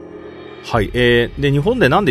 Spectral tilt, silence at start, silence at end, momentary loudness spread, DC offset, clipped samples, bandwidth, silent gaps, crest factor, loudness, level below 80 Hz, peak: -6.5 dB/octave; 0 s; 0 s; 21 LU; under 0.1%; under 0.1%; 13.5 kHz; none; 16 dB; -15 LUFS; -34 dBFS; 0 dBFS